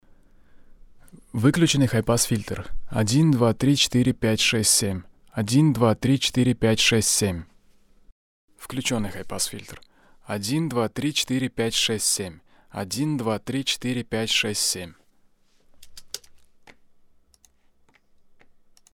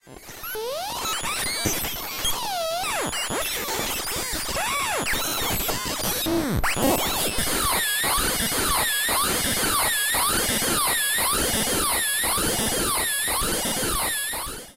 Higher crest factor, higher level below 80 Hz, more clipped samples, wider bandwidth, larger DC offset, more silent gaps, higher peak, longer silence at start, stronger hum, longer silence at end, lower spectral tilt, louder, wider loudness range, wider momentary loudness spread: about the same, 18 dB vs 18 dB; second, -48 dBFS vs -40 dBFS; neither; about the same, 17.5 kHz vs 16 kHz; neither; first, 8.12-8.48 s vs none; about the same, -6 dBFS vs -8 dBFS; first, 0.55 s vs 0.05 s; neither; first, 2.6 s vs 0.05 s; first, -4 dB/octave vs -1.5 dB/octave; about the same, -22 LUFS vs -23 LUFS; first, 8 LU vs 5 LU; first, 16 LU vs 6 LU